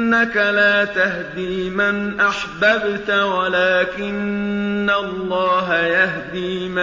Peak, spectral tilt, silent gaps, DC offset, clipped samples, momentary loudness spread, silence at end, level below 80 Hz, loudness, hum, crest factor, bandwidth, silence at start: -4 dBFS; -5.5 dB/octave; none; under 0.1%; under 0.1%; 8 LU; 0 s; -50 dBFS; -18 LUFS; none; 14 dB; 7.6 kHz; 0 s